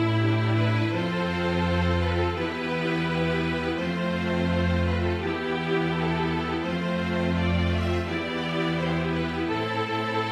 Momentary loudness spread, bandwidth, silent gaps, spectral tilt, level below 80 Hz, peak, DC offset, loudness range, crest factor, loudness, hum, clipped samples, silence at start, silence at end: 4 LU; 11 kHz; none; -7 dB/octave; -38 dBFS; -14 dBFS; under 0.1%; 1 LU; 12 dB; -26 LUFS; none; under 0.1%; 0 s; 0 s